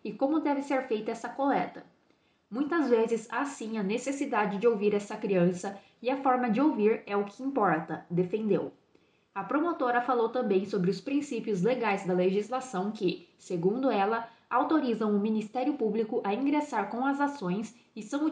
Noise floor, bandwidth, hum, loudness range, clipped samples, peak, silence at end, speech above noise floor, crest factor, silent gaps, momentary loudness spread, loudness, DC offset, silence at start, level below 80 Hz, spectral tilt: -68 dBFS; 10 kHz; none; 2 LU; under 0.1%; -12 dBFS; 0 s; 40 dB; 18 dB; none; 8 LU; -29 LUFS; under 0.1%; 0.05 s; -78 dBFS; -6.5 dB/octave